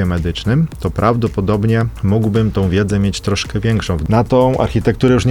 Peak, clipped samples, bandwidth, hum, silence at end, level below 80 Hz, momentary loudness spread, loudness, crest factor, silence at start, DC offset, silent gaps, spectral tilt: 0 dBFS; under 0.1%; 13.5 kHz; none; 0 s; -30 dBFS; 4 LU; -15 LUFS; 14 dB; 0 s; 0.1%; none; -7 dB/octave